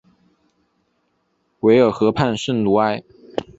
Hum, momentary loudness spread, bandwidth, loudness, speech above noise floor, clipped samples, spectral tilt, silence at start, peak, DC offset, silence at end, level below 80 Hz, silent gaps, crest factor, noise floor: none; 15 LU; 8 kHz; -18 LUFS; 51 dB; under 0.1%; -6.5 dB/octave; 1.65 s; -2 dBFS; under 0.1%; 0.15 s; -52 dBFS; none; 18 dB; -67 dBFS